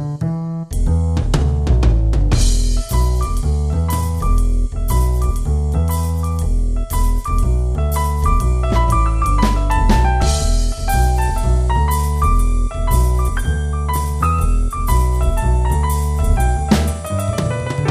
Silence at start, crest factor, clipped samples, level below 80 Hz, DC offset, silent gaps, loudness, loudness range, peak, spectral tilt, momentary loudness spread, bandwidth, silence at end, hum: 0 s; 14 dB; under 0.1%; -16 dBFS; 0.4%; none; -18 LUFS; 2 LU; 0 dBFS; -6 dB/octave; 4 LU; 15.5 kHz; 0 s; none